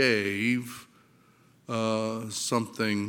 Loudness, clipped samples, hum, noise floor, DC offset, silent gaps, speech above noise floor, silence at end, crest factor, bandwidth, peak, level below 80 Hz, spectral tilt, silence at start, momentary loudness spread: -29 LUFS; under 0.1%; none; -61 dBFS; under 0.1%; none; 33 dB; 0 s; 20 dB; 17 kHz; -8 dBFS; -76 dBFS; -4 dB/octave; 0 s; 9 LU